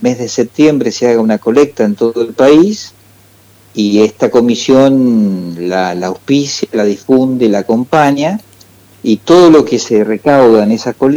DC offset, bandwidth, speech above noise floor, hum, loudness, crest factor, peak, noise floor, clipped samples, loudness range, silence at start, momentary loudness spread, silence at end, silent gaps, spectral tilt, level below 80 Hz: under 0.1%; 16.5 kHz; 34 dB; none; -10 LUFS; 10 dB; 0 dBFS; -43 dBFS; 0.2%; 3 LU; 0 s; 9 LU; 0 s; none; -5.5 dB/octave; -50 dBFS